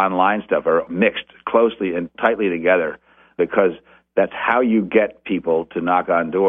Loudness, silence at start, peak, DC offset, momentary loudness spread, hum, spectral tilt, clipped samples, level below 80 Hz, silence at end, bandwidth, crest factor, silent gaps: -19 LUFS; 0 s; 0 dBFS; under 0.1%; 7 LU; none; -8.5 dB/octave; under 0.1%; -56 dBFS; 0 s; 3.8 kHz; 18 dB; none